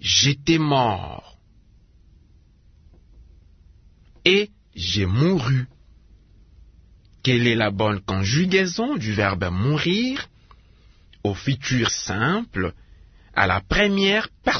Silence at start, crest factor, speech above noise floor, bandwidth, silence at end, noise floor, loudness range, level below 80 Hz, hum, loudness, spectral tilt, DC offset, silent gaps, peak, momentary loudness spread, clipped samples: 0.05 s; 22 dB; 33 dB; 6.6 kHz; 0 s; -54 dBFS; 5 LU; -46 dBFS; none; -21 LUFS; -4.5 dB/octave; under 0.1%; none; 0 dBFS; 11 LU; under 0.1%